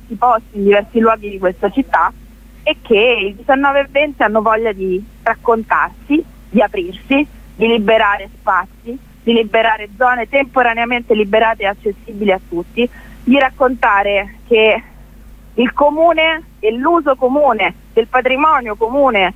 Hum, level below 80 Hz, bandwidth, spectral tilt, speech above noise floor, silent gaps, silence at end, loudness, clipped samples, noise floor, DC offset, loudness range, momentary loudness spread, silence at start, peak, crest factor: none; -40 dBFS; 15.5 kHz; -6 dB/octave; 24 dB; none; 0.05 s; -14 LUFS; under 0.1%; -38 dBFS; under 0.1%; 2 LU; 8 LU; 0.1 s; 0 dBFS; 14 dB